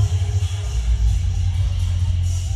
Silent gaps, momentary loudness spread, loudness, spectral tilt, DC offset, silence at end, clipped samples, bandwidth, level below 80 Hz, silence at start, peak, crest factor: none; 2 LU; -22 LUFS; -5.5 dB/octave; under 0.1%; 0 s; under 0.1%; 11 kHz; -22 dBFS; 0 s; -8 dBFS; 10 dB